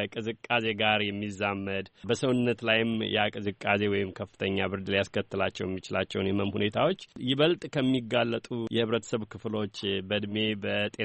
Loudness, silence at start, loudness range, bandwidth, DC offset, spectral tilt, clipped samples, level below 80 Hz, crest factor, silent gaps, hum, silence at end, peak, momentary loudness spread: -29 LUFS; 0 s; 2 LU; 8.4 kHz; under 0.1%; -5.5 dB/octave; under 0.1%; -64 dBFS; 20 dB; none; none; 0 s; -10 dBFS; 8 LU